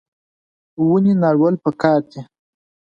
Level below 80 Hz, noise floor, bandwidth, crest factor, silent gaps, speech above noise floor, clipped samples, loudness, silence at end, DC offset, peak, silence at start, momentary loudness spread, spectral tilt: -62 dBFS; under -90 dBFS; 7.2 kHz; 16 dB; none; over 74 dB; under 0.1%; -16 LUFS; 0.65 s; under 0.1%; -4 dBFS; 0.8 s; 12 LU; -9.5 dB/octave